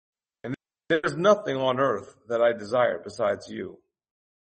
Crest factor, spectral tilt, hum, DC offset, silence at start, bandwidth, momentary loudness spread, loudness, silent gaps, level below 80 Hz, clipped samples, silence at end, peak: 20 dB; -5.5 dB/octave; none; under 0.1%; 0.45 s; 8.4 kHz; 15 LU; -25 LUFS; none; -68 dBFS; under 0.1%; 0.85 s; -8 dBFS